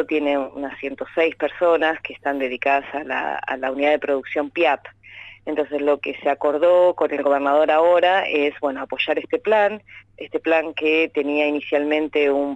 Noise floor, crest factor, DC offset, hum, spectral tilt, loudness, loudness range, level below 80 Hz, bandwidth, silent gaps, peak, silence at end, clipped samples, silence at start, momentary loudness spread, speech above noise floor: -42 dBFS; 14 dB; under 0.1%; none; -5.5 dB/octave; -20 LUFS; 4 LU; -62 dBFS; 8 kHz; none; -6 dBFS; 0 s; under 0.1%; 0 s; 10 LU; 22 dB